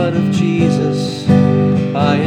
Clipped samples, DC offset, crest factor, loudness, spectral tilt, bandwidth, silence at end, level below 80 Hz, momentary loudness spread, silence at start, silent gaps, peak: under 0.1%; under 0.1%; 12 dB; -14 LUFS; -7.5 dB/octave; 10 kHz; 0 s; -50 dBFS; 5 LU; 0 s; none; 0 dBFS